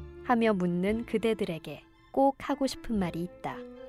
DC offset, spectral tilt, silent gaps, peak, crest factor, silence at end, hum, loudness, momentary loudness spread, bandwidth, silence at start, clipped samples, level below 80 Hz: under 0.1%; -6.5 dB/octave; none; -14 dBFS; 16 dB; 0 s; none; -30 LUFS; 12 LU; 14.5 kHz; 0 s; under 0.1%; -52 dBFS